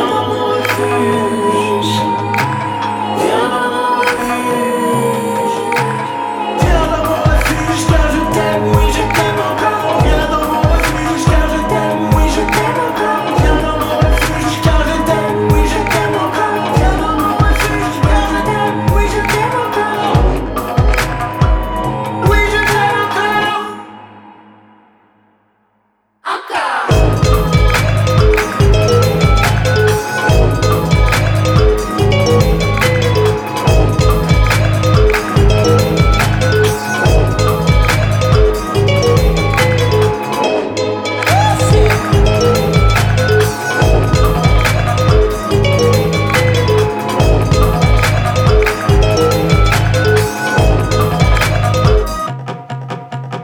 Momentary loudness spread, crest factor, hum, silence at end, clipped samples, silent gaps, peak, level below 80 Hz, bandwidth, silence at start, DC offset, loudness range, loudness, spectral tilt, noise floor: 4 LU; 12 dB; none; 0 s; under 0.1%; none; 0 dBFS; -18 dBFS; 19 kHz; 0 s; under 0.1%; 3 LU; -13 LUFS; -5.5 dB/octave; -60 dBFS